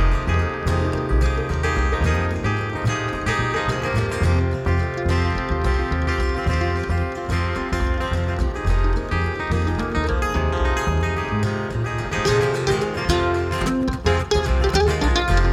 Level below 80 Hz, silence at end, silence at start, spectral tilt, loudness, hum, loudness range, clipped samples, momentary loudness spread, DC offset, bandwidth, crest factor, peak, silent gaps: -26 dBFS; 0 s; 0 s; -6 dB/octave; -22 LUFS; none; 2 LU; under 0.1%; 4 LU; under 0.1%; 13.5 kHz; 16 dB; -4 dBFS; none